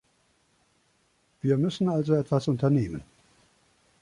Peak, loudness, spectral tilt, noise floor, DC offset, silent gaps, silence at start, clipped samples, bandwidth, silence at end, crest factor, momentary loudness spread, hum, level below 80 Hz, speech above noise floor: -12 dBFS; -26 LUFS; -8.5 dB/octave; -68 dBFS; under 0.1%; none; 1.45 s; under 0.1%; 11 kHz; 1 s; 18 dB; 8 LU; none; -58 dBFS; 43 dB